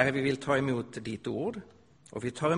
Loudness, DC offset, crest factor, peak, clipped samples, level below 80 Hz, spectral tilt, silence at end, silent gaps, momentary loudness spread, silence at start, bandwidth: -32 LUFS; under 0.1%; 24 dB; -8 dBFS; under 0.1%; -62 dBFS; -6 dB/octave; 0 s; none; 11 LU; 0 s; 10.5 kHz